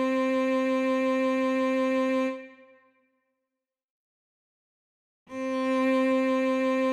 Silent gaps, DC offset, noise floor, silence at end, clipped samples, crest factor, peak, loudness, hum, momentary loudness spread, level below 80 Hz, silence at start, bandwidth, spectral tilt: 3.84-5.26 s; under 0.1%; -87 dBFS; 0 s; under 0.1%; 12 dB; -16 dBFS; -26 LUFS; none; 8 LU; -78 dBFS; 0 s; 10 kHz; -4.5 dB/octave